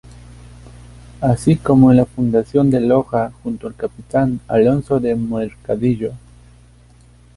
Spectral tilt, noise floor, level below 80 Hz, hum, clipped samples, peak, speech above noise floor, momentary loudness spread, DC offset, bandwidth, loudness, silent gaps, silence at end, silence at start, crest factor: -9 dB/octave; -47 dBFS; -42 dBFS; 60 Hz at -35 dBFS; under 0.1%; -2 dBFS; 31 dB; 13 LU; under 0.1%; 11.5 kHz; -17 LUFS; none; 1.2 s; 0.5 s; 16 dB